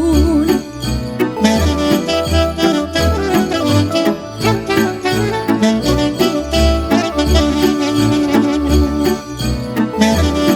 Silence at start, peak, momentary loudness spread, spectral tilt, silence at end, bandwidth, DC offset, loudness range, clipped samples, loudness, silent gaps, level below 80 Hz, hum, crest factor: 0 s; 0 dBFS; 5 LU; -5.5 dB/octave; 0 s; 18.5 kHz; under 0.1%; 1 LU; under 0.1%; -15 LUFS; none; -24 dBFS; none; 14 dB